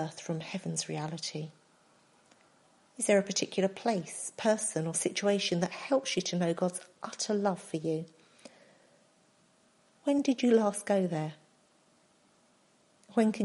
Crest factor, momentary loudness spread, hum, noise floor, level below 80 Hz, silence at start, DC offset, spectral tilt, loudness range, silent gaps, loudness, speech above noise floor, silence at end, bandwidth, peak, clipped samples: 20 dB; 10 LU; none; -67 dBFS; -80 dBFS; 0 s; under 0.1%; -4.5 dB/octave; 5 LU; none; -31 LUFS; 36 dB; 0 s; 11.5 kHz; -14 dBFS; under 0.1%